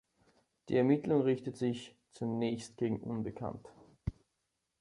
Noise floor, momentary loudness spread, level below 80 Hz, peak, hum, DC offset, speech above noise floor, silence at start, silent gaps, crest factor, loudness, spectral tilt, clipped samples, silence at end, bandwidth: -84 dBFS; 15 LU; -58 dBFS; -16 dBFS; none; under 0.1%; 50 dB; 0.65 s; none; 18 dB; -35 LUFS; -7.5 dB/octave; under 0.1%; 0.7 s; 11.5 kHz